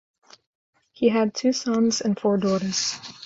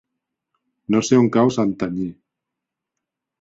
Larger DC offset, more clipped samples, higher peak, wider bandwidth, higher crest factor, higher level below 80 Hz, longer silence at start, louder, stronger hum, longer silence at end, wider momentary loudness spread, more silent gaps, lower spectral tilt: neither; neither; second, -8 dBFS vs -4 dBFS; about the same, 7.8 kHz vs 7.8 kHz; about the same, 18 dB vs 18 dB; second, -64 dBFS vs -58 dBFS; about the same, 1 s vs 0.9 s; second, -23 LUFS vs -19 LUFS; neither; second, 0 s vs 1.3 s; second, 3 LU vs 14 LU; neither; second, -4.5 dB/octave vs -6 dB/octave